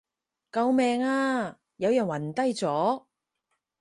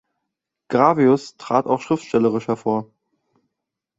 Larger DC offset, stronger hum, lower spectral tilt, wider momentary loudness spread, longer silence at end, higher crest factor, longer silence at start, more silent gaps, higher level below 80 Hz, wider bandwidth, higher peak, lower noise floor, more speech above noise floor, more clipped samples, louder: neither; neither; second, -5.5 dB/octave vs -7 dB/octave; about the same, 8 LU vs 8 LU; second, 0.8 s vs 1.15 s; second, 14 dB vs 20 dB; second, 0.55 s vs 0.7 s; neither; second, -72 dBFS vs -64 dBFS; first, 11.5 kHz vs 8 kHz; second, -14 dBFS vs -2 dBFS; about the same, -80 dBFS vs -82 dBFS; second, 54 dB vs 64 dB; neither; second, -27 LUFS vs -20 LUFS